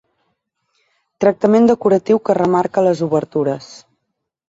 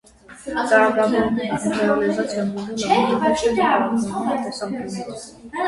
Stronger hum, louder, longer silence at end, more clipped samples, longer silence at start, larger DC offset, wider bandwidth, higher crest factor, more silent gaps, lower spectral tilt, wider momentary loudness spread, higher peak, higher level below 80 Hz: neither; first, -15 LUFS vs -20 LUFS; first, 0.7 s vs 0 s; neither; first, 1.2 s vs 0.3 s; neither; second, 8 kHz vs 11.5 kHz; about the same, 16 dB vs 16 dB; neither; first, -7.5 dB/octave vs -5 dB/octave; second, 8 LU vs 13 LU; first, 0 dBFS vs -4 dBFS; second, -58 dBFS vs -52 dBFS